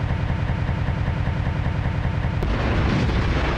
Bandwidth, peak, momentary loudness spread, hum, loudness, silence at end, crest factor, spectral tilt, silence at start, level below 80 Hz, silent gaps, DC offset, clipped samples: 8.4 kHz; -8 dBFS; 3 LU; none; -23 LUFS; 0 s; 14 dB; -7.5 dB/octave; 0 s; -26 dBFS; none; under 0.1%; under 0.1%